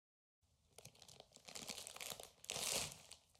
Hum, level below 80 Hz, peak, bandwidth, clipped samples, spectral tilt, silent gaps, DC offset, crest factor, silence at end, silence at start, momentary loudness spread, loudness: none; -76 dBFS; -22 dBFS; 16 kHz; under 0.1%; -0.5 dB/octave; none; under 0.1%; 28 dB; 0.2 s; 0.8 s; 21 LU; -46 LUFS